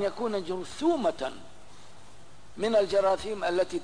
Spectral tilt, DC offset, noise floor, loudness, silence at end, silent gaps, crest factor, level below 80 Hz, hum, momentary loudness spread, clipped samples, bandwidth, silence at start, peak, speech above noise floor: -4.5 dB/octave; 0.8%; -54 dBFS; -28 LUFS; 0 s; none; 14 dB; -58 dBFS; none; 12 LU; under 0.1%; 10.5 kHz; 0 s; -16 dBFS; 26 dB